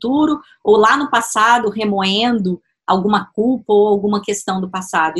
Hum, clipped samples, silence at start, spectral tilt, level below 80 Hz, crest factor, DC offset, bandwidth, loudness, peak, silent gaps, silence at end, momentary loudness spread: none; under 0.1%; 0 s; -4.5 dB/octave; -56 dBFS; 16 dB; under 0.1%; 12.5 kHz; -16 LUFS; 0 dBFS; none; 0 s; 8 LU